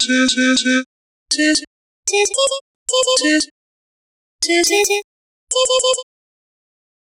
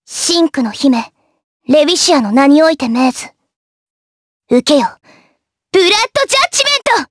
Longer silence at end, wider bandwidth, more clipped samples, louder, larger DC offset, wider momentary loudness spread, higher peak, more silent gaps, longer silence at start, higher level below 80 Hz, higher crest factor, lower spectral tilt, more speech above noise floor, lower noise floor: first, 0.95 s vs 0.05 s; first, 16 kHz vs 11 kHz; neither; second, -16 LUFS vs -11 LUFS; neither; about the same, 9 LU vs 8 LU; about the same, -2 dBFS vs 0 dBFS; first, 0.86-1.26 s, 1.67-2.03 s, 2.61-2.86 s, 3.51-4.39 s, 5.04-5.47 s vs 1.44-1.60 s, 3.56-4.40 s; about the same, 0 s vs 0.1 s; about the same, -58 dBFS vs -56 dBFS; about the same, 16 dB vs 14 dB; second, 0 dB/octave vs -2 dB/octave; first, over 74 dB vs 48 dB; first, under -90 dBFS vs -59 dBFS